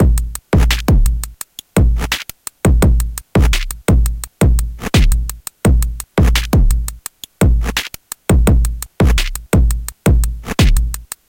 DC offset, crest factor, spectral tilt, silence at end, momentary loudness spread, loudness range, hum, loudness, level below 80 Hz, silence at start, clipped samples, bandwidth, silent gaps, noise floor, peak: under 0.1%; 14 dB; -5.5 dB/octave; 0.25 s; 8 LU; 1 LU; none; -16 LUFS; -16 dBFS; 0 s; under 0.1%; 17.5 kHz; none; -33 dBFS; 0 dBFS